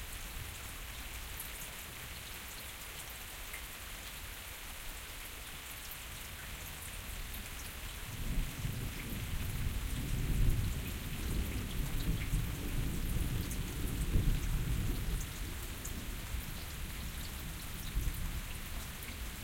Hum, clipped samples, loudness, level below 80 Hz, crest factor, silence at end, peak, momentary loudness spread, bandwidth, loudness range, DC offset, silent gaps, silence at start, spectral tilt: none; under 0.1%; -41 LUFS; -40 dBFS; 20 dB; 0 s; -18 dBFS; 7 LU; 17 kHz; 6 LU; under 0.1%; none; 0 s; -4 dB/octave